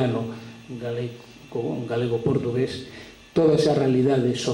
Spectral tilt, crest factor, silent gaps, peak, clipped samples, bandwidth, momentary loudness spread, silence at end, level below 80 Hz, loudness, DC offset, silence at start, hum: -6.5 dB/octave; 14 dB; none; -8 dBFS; under 0.1%; 16 kHz; 18 LU; 0 s; -56 dBFS; -24 LUFS; under 0.1%; 0 s; none